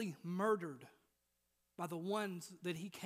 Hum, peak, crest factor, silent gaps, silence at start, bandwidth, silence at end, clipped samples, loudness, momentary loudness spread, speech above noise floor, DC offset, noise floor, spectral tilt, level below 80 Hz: none; -24 dBFS; 20 dB; none; 0 s; 15.5 kHz; 0 s; under 0.1%; -42 LUFS; 13 LU; 42 dB; under 0.1%; -84 dBFS; -5.5 dB/octave; -88 dBFS